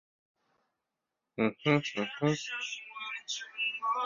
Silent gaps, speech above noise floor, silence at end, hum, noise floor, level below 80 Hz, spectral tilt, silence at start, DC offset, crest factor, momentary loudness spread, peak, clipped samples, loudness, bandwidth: none; 56 dB; 0 s; none; -87 dBFS; -74 dBFS; -4.5 dB/octave; 1.35 s; under 0.1%; 24 dB; 10 LU; -12 dBFS; under 0.1%; -33 LUFS; 7.4 kHz